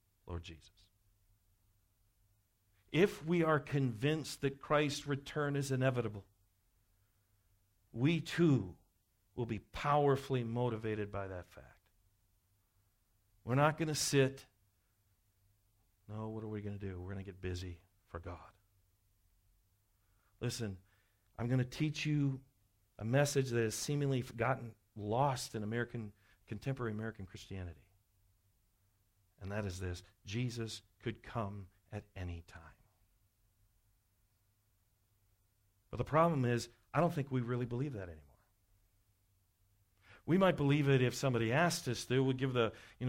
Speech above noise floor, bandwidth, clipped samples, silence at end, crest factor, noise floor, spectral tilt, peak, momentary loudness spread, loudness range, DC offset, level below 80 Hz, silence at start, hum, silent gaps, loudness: 40 dB; 16 kHz; under 0.1%; 0 s; 20 dB; -76 dBFS; -6 dB/octave; -18 dBFS; 18 LU; 12 LU; under 0.1%; -64 dBFS; 0.25 s; none; none; -36 LUFS